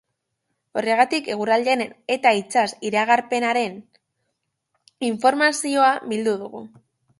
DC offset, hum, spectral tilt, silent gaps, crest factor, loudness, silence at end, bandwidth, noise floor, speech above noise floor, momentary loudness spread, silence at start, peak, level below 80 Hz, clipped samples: under 0.1%; none; -3 dB/octave; none; 20 dB; -21 LUFS; 0.55 s; 11.5 kHz; -77 dBFS; 56 dB; 10 LU; 0.75 s; -2 dBFS; -72 dBFS; under 0.1%